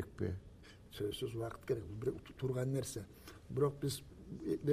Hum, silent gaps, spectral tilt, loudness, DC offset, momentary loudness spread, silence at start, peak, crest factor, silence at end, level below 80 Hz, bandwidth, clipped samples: none; none; -6 dB/octave; -41 LUFS; under 0.1%; 16 LU; 0 s; -22 dBFS; 18 dB; 0 s; -60 dBFS; 15.5 kHz; under 0.1%